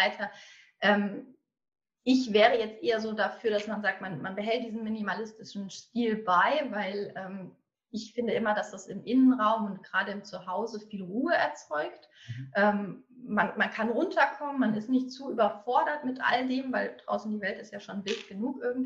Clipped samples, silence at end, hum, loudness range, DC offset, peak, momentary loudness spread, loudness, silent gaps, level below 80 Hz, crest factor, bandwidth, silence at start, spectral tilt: under 0.1%; 0 s; none; 3 LU; under 0.1%; -8 dBFS; 15 LU; -29 LUFS; none; -74 dBFS; 22 dB; 7.8 kHz; 0 s; -5.5 dB/octave